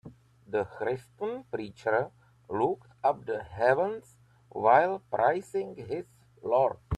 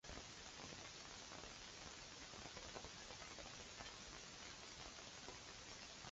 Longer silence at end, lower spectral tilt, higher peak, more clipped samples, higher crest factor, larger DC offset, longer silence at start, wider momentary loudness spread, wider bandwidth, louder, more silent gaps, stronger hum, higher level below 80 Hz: about the same, 0 s vs 0 s; first, -7 dB/octave vs -1.5 dB/octave; first, -8 dBFS vs -34 dBFS; neither; about the same, 22 dB vs 22 dB; neither; about the same, 0.05 s vs 0.05 s; first, 14 LU vs 1 LU; first, 12 kHz vs 8 kHz; first, -29 LUFS vs -54 LUFS; neither; neither; first, -58 dBFS vs -68 dBFS